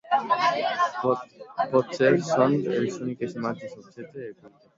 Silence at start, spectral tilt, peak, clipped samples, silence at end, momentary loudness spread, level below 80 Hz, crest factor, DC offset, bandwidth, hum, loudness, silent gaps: 0.05 s; -6 dB/octave; -6 dBFS; under 0.1%; 0.3 s; 18 LU; -70 dBFS; 18 dB; under 0.1%; 7.8 kHz; none; -25 LUFS; none